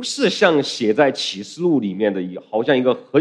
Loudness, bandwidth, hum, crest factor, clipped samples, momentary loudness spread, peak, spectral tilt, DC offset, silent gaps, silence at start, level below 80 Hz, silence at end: -19 LUFS; 11 kHz; none; 18 dB; under 0.1%; 8 LU; 0 dBFS; -4.5 dB/octave; under 0.1%; none; 0 s; -70 dBFS; 0 s